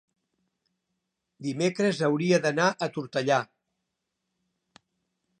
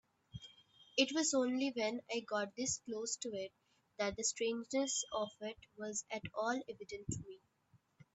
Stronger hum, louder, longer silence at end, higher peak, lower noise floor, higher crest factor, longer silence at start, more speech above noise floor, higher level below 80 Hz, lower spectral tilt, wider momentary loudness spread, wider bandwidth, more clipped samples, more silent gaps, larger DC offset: neither; first, -26 LUFS vs -39 LUFS; first, 1.95 s vs 0.75 s; first, -8 dBFS vs -16 dBFS; first, -82 dBFS vs -73 dBFS; about the same, 22 dB vs 24 dB; first, 1.4 s vs 0.35 s; first, 57 dB vs 34 dB; second, -78 dBFS vs -70 dBFS; first, -5 dB/octave vs -2.5 dB/octave; second, 11 LU vs 14 LU; first, 9.8 kHz vs 8.4 kHz; neither; neither; neither